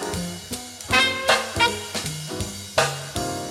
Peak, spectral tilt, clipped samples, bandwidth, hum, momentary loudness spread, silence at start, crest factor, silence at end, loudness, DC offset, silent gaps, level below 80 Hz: -4 dBFS; -2.5 dB/octave; under 0.1%; 16.5 kHz; none; 12 LU; 0 s; 20 dB; 0 s; -23 LUFS; under 0.1%; none; -46 dBFS